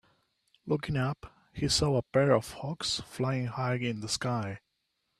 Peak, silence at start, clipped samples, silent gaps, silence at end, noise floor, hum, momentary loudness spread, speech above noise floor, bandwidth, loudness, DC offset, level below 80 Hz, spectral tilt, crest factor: -10 dBFS; 0.65 s; under 0.1%; none; 0.6 s; -80 dBFS; none; 14 LU; 49 dB; 13.5 kHz; -30 LUFS; under 0.1%; -54 dBFS; -5 dB/octave; 22 dB